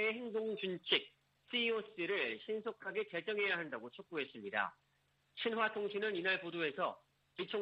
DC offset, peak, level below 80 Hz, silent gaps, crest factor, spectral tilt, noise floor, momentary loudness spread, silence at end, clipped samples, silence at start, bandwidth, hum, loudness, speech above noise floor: under 0.1%; -18 dBFS; -86 dBFS; none; 22 dB; -6 dB/octave; -77 dBFS; 10 LU; 0 s; under 0.1%; 0 s; 5.6 kHz; none; -39 LUFS; 38 dB